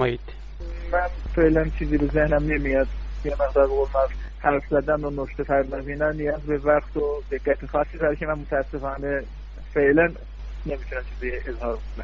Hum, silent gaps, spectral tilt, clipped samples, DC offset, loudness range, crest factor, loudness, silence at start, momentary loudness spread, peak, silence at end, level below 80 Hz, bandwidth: none; none; -8.5 dB/octave; under 0.1%; under 0.1%; 3 LU; 18 dB; -24 LUFS; 0 s; 12 LU; -6 dBFS; 0 s; -32 dBFS; 6.8 kHz